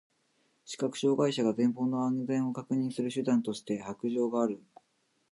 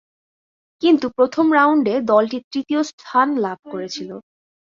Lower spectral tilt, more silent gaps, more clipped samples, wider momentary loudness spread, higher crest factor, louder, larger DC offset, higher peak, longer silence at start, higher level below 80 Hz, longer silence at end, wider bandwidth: about the same, -6 dB/octave vs -5 dB/octave; second, none vs 2.44-2.51 s, 2.93-2.98 s, 3.59-3.63 s; neither; second, 8 LU vs 14 LU; about the same, 16 dB vs 18 dB; second, -31 LUFS vs -18 LUFS; neither; second, -16 dBFS vs -2 dBFS; second, 0.65 s vs 0.8 s; second, -78 dBFS vs -64 dBFS; first, 0.75 s vs 0.5 s; first, 11.5 kHz vs 7.4 kHz